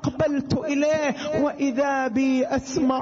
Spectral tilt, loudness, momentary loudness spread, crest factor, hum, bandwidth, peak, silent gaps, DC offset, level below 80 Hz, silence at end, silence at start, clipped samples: -5.5 dB/octave; -23 LUFS; 3 LU; 14 dB; none; 7.6 kHz; -10 dBFS; none; under 0.1%; -52 dBFS; 0 s; 0 s; under 0.1%